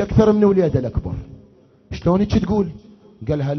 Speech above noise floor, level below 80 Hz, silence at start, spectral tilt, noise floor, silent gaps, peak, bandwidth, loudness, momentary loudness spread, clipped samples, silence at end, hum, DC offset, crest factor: 33 dB; -34 dBFS; 0 s; -9 dB/octave; -51 dBFS; none; -2 dBFS; 6.4 kHz; -18 LUFS; 17 LU; under 0.1%; 0 s; none; under 0.1%; 18 dB